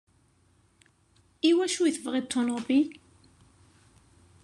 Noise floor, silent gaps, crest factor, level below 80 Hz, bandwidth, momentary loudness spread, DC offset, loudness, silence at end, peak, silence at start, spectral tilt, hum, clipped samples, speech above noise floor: -65 dBFS; none; 18 dB; -70 dBFS; 12 kHz; 6 LU; under 0.1%; -27 LUFS; 1.5 s; -12 dBFS; 1.45 s; -3 dB/octave; none; under 0.1%; 39 dB